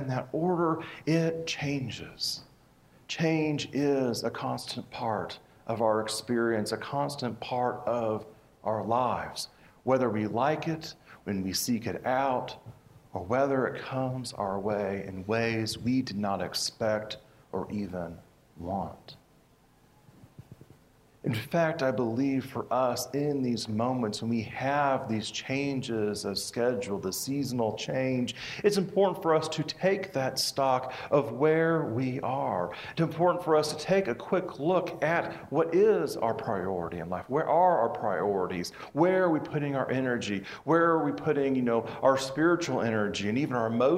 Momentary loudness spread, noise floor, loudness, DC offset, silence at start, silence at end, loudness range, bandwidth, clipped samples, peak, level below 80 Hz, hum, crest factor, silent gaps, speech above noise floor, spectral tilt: 9 LU; -62 dBFS; -29 LUFS; under 0.1%; 0 s; 0 s; 5 LU; 16 kHz; under 0.1%; -10 dBFS; -66 dBFS; none; 20 dB; none; 33 dB; -5.5 dB/octave